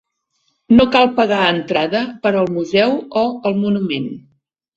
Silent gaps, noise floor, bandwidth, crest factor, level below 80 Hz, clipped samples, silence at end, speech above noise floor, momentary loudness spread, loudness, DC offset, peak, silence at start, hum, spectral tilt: none; -67 dBFS; 7.8 kHz; 16 dB; -48 dBFS; under 0.1%; 0.55 s; 52 dB; 8 LU; -16 LUFS; under 0.1%; 0 dBFS; 0.7 s; none; -6.5 dB/octave